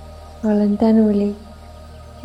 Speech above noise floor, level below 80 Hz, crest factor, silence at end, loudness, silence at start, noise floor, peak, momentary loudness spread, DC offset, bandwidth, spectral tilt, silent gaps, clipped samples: 22 dB; -42 dBFS; 14 dB; 0 s; -17 LUFS; 0 s; -38 dBFS; -6 dBFS; 17 LU; under 0.1%; 8 kHz; -9 dB/octave; none; under 0.1%